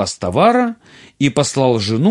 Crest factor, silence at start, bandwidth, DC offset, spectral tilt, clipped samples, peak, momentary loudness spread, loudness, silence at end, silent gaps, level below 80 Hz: 14 dB; 0 s; 11.5 kHz; under 0.1%; -5.5 dB/octave; under 0.1%; -2 dBFS; 7 LU; -15 LUFS; 0 s; none; -54 dBFS